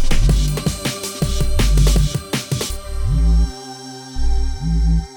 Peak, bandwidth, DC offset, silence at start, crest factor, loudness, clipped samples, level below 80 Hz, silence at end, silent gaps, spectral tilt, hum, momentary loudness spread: -2 dBFS; 19 kHz; under 0.1%; 0 s; 14 dB; -20 LUFS; under 0.1%; -18 dBFS; 0 s; none; -5 dB/octave; none; 10 LU